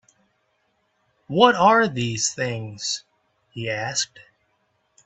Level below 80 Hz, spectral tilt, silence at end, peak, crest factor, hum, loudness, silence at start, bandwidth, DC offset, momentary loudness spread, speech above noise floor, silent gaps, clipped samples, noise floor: -64 dBFS; -3.5 dB/octave; 0.85 s; 0 dBFS; 24 dB; none; -21 LUFS; 1.3 s; 8.4 kHz; under 0.1%; 14 LU; 48 dB; none; under 0.1%; -69 dBFS